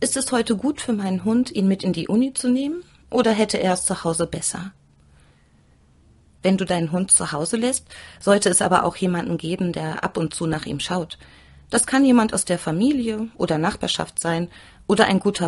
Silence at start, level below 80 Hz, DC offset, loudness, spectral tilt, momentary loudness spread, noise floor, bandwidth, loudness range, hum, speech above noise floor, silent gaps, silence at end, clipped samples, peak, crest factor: 0 s; -52 dBFS; under 0.1%; -21 LUFS; -4 dB/octave; 10 LU; -56 dBFS; 11.5 kHz; 4 LU; none; 35 dB; none; 0 s; under 0.1%; 0 dBFS; 22 dB